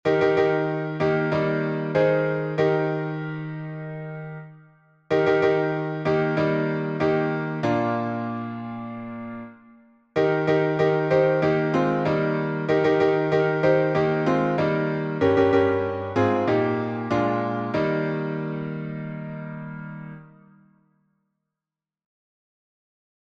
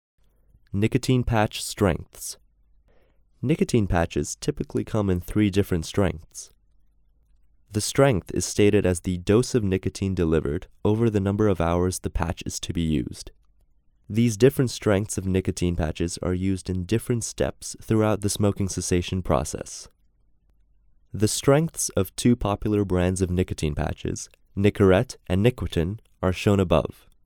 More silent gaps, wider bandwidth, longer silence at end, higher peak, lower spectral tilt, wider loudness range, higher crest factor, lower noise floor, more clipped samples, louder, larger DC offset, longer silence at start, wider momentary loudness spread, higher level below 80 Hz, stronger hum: neither; second, 7.2 kHz vs 18.5 kHz; first, 3 s vs 0.35 s; second, -8 dBFS vs -4 dBFS; first, -8 dB/octave vs -6 dB/octave; first, 8 LU vs 4 LU; about the same, 16 dB vs 20 dB; first, -90 dBFS vs -61 dBFS; neither; about the same, -23 LUFS vs -24 LUFS; neither; second, 0.05 s vs 0.75 s; first, 14 LU vs 11 LU; second, -60 dBFS vs -40 dBFS; neither